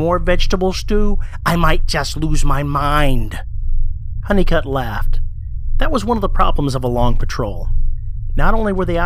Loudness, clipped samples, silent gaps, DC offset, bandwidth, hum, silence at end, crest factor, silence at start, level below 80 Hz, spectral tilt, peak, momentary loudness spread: -19 LUFS; under 0.1%; none; under 0.1%; 13 kHz; none; 0 s; 14 dB; 0 s; -16 dBFS; -6 dB/octave; 0 dBFS; 10 LU